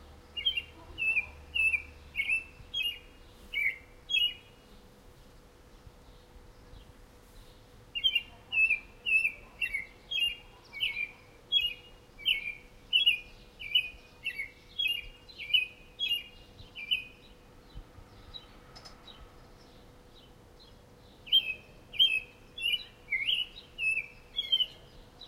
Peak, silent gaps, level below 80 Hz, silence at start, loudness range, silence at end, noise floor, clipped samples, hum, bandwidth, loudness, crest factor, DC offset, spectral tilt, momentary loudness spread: -14 dBFS; none; -56 dBFS; 0 s; 7 LU; 0 s; -56 dBFS; under 0.1%; none; 16 kHz; -30 LUFS; 22 dB; under 0.1%; -0.5 dB/octave; 21 LU